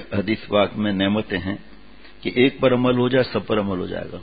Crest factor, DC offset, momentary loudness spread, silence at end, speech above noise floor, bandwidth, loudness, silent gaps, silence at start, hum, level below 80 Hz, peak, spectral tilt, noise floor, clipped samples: 18 dB; 0.7%; 11 LU; 0 s; 26 dB; 5 kHz; -21 LUFS; none; 0 s; none; -48 dBFS; -4 dBFS; -11 dB/octave; -47 dBFS; under 0.1%